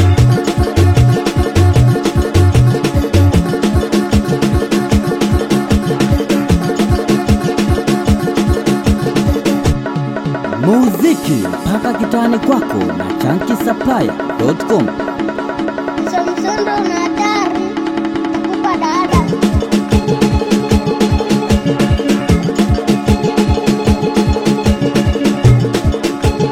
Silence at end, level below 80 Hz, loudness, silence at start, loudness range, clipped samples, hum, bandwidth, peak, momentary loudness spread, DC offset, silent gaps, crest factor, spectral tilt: 0 s; -24 dBFS; -14 LUFS; 0 s; 4 LU; under 0.1%; none; 16.5 kHz; 0 dBFS; 6 LU; 0.3%; none; 12 dB; -6.5 dB/octave